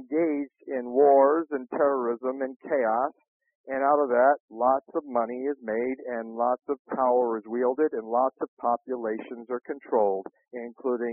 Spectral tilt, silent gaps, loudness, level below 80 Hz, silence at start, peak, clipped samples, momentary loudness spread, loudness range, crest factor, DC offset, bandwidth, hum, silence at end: 0.5 dB/octave; 3.28-3.40 s, 3.55-3.64 s, 4.40-4.48 s, 6.79-6.85 s, 8.48-8.57 s; -26 LUFS; -72 dBFS; 0 s; -8 dBFS; under 0.1%; 12 LU; 3 LU; 18 dB; under 0.1%; 3 kHz; none; 0 s